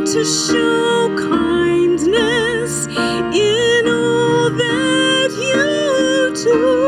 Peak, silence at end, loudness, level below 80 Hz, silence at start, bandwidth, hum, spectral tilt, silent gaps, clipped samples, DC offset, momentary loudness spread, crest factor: -4 dBFS; 0 s; -15 LUFS; -46 dBFS; 0 s; 14.5 kHz; none; -3.5 dB/octave; none; under 0.1%; under 0.1%; 3 LU; 10 dB